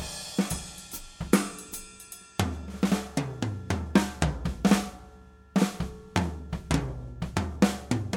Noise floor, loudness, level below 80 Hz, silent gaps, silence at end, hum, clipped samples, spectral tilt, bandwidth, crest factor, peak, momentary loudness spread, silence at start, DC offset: -51 dBFS; -29 LUFS; -42 dBFS; none; 0 s; none; under 0.1%; -5.5 dB/octave; 17.5 kHz; 24 dB; -6 dBFS; 14 LU; 0 s; under 0.1%